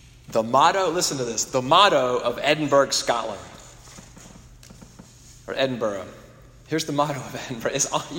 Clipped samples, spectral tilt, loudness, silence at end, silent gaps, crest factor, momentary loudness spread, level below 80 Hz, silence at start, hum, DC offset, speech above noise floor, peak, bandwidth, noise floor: under 0.1%; -3 dB/octave; -22 LUFS; 0 s; none; 22 dB; 16 LU; -54 dBFS; 0.3 s; none; under 0.1%; 25 dB; -2 dBFS; 16.5 kHz; -47 dBFS